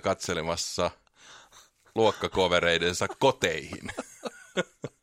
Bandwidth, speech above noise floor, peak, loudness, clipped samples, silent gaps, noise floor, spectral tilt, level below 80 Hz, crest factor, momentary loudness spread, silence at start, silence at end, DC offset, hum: 16 kHz; 30 dB; -8 dBFS; -28 LUFS; under 0.1%; none; -58 dBFS; -3.5 dB/octave; -56 dBFS; 22 dB; 15 LU; 0.05 s; 0.15 s; under 0.1%; none